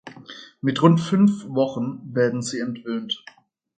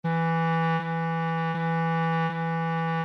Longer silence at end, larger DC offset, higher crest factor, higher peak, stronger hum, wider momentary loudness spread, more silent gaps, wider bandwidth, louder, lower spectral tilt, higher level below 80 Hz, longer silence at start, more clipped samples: first, 0.6 s vs 0 s; neither; first, 20 dB vs 8 dB; first, -2 dBFS vs -18 dBFS; neither; first, 13 LU vs 3 LU; neither; first, 9.4 kHz vs 5.8 kHz; first, -22 LUFS vs -27 LUFS; second, -6.5 dB/octave vs -8.5 dB/octave; first, -66 dBFS vs -76 dBFS; about the same, 0.05 s vs 0.05 s; neither